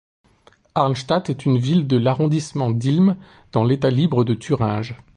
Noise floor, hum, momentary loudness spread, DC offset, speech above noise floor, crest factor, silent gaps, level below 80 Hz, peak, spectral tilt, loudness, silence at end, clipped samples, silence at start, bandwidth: -55 dBFS; none; 5 LU; under 0.1%; 36 dB; 16 dB; none; -52 dBFS; -4 dBFS; -7.5 dB/octave; -20 LUFS; 0.2 s; under 0.1%; 0.75 s; 10 kHz